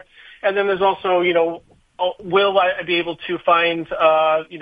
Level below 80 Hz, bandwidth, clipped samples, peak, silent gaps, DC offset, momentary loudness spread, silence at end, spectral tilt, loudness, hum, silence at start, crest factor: -58 dBFS; 5 kHz; under 0.1%; -2 dBFS; none; under 0.1%; 9 LU; 0 s; -7 dB/octave; -18 LUFS; none; 0.3 s; 16 dB